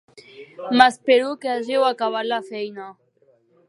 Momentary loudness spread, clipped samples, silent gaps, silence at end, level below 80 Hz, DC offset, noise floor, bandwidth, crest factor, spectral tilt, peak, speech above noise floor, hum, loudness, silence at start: 18 LU; under 0.1%; none; 0.75 s; -68 dBFS; under 0.1%; -60 dBFS; 11.5 kHz; 22 dB; -3.5 dB/octave; 0 dBFS; 40 dB; none; -20 LUFS; 0.35 s